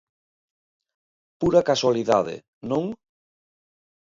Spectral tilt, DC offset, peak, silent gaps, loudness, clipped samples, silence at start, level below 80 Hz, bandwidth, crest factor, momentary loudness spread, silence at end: -5.5 dB/octave; under 0.1%; -6 dBFS; 2.48-2.61 s; -22 LUFS; under 0.1%; 1.4 s; -56 dBFS; 7.6 kHz; 20 dB; 15 LU; 1.2 s